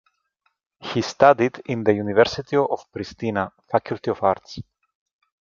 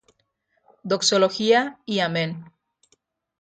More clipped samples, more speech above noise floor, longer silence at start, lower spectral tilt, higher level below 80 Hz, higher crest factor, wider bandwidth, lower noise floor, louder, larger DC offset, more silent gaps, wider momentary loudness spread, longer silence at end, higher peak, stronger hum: neither; about the same, 50 dB vs 49 dB; about the same, 0.8 s vs 0.85 s; first, -6 dB/octave vs -3.5 dB/octave; first, -54 dBFS vs -70 dBFS; about the same, 22 dB vs 18 dB; second, 7.4 kHz vs 9.4 kHz; about the same, -72 dBFS vs -71 dBFS; about the same, -22 LUFS vs -21 LUFS; neither; neither; about the same, 13 LU vs 13 LU; about the same, 0.85 s vs 0.95 s; first, 0 dBFS vs -6 dBFS; neither